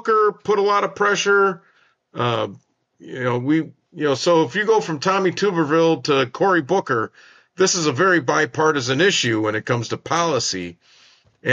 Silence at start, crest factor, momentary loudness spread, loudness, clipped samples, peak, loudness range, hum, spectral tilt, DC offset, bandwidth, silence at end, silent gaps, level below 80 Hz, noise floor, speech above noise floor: 0.05 s; 16 dB; 8 LU; -19 LUFS; under 0.1%; -4 dBFS; 3 LU; none; -4 dB/octave; under 0.1%; 9.4 kHz; 0 s; none; -66 dBFS; -52 dBFS; 33 dB